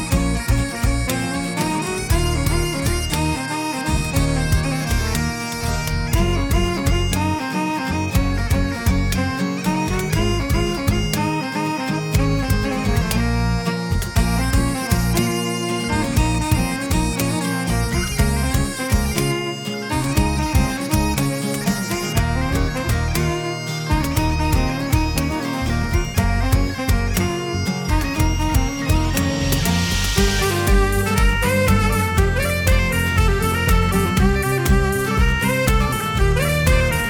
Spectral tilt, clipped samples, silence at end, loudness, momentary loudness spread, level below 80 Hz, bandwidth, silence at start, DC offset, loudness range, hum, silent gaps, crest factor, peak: -5 dB/octave; under 0.1%; 0 s; -20 LUFS; 4 LU; -24 dBFS; 19 kHz; 0 s; under 0.1%; 3 LU; none; none; 14 dB; -4 dBFS